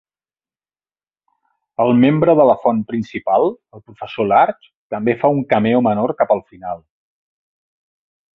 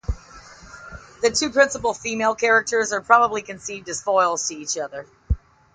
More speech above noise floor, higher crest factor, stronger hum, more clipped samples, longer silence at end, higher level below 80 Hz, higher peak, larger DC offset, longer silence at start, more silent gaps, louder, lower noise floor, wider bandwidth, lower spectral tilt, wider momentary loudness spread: first, over 74 dB vs 23 dB; about the same, 18 dB vs 20 dB; neither; neither; first, 1.6 s vs 0.35 s; second, -56 dBFS vs -36 dBFS; about the same, 0 dBFS vs -2 dBFS; neither; first, 1.8 s vs 0.1 s; first, 4.75-4.90 s vs none; first, -16 LUFS vs -21 LUFS; first, under -90 dBFS vs -44 dBFS; second, 5.8 kHz vs 9.6 kHz; first, -9.5 dB/octave vs -3 dB/octave; about the same, 17 LU vs 18 LU